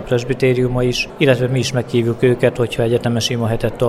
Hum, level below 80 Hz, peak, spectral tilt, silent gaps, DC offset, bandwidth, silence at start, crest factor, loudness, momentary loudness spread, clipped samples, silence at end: none; -38 dBFS; 0 dBFS; -6 dB/octave; none; under 0.1%; 14 kHz; 0 s; 16 dB; -17 LUFS; 4 LU; under 0.1%; 0 s